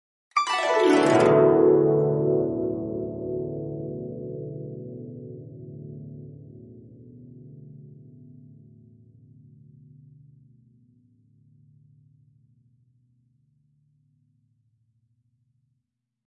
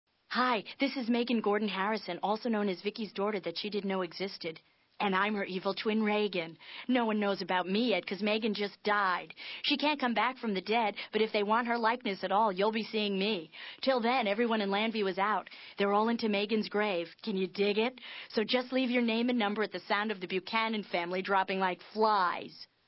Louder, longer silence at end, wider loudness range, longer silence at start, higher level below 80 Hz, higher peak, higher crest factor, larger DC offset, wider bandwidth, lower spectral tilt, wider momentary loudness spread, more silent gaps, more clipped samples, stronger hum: first, -23 LUFS vs -31 LUFS; first, 8.3 s vs 0.2 s; first, 28 LU vs 3 LU; about the same, 0.35 s vs 0.3 s; first, -64 dBFS vs -82 dBFS; first, -6 dBFS vs -14 dBFS; about the same, 20 dB vs 18 dB; neither; first, 11.5 kHz vs 5.8 kHz; second, -6.5 dB/octave vs -8.5 dB/octave; first, 28 LU vs 7 LU; neither; neither; neither